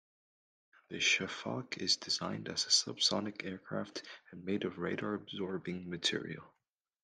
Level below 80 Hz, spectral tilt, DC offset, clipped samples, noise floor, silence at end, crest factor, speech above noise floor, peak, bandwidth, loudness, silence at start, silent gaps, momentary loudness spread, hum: -80 dBFS; -2.5 dB/octave; under 0.1%; under 0.1%; -87 dBFS; 0.55 s; 24 dB; 50 dB; -14 dBFS; 11.5 kHz; -34 LUFS; 0.9 s; none; 16 LU; none